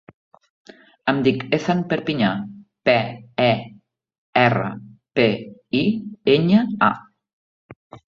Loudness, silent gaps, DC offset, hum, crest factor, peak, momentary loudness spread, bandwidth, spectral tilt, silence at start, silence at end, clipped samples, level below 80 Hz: -20 LUFS; 4.18-4.33 s, 7.33-7.69 s, 7.76-7.90 s; under 0.1%; none; 20 dB; -2 dBFS; 12 LU; 7 kHz; -7 dB/octave; 1.05 s; 0.1 s; under 0.1%; -58 dBFS